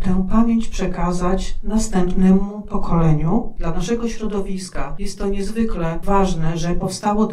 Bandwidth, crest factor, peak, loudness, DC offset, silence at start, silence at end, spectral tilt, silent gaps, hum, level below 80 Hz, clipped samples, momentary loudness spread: 11 kHz; 14 dB; -2 dBFS; -21 LUFS; under 0.1%; 0 s; 0 s; -6.5 dB/octave; none; none; -24 dBFS; under 0.1%; 9 LU